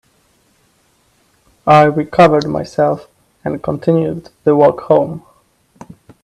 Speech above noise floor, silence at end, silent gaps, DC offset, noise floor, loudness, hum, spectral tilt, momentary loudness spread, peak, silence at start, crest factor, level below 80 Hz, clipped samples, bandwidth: 44 dB; 1.05 s; none; under 0.1%; -57 dBFS; -14 LUFS; none; -7.5 dB/octave; 14 LU; 0 dBFS; 1.65 s; 16 dB; -50 dBFS; under 0.1%; 12 kHz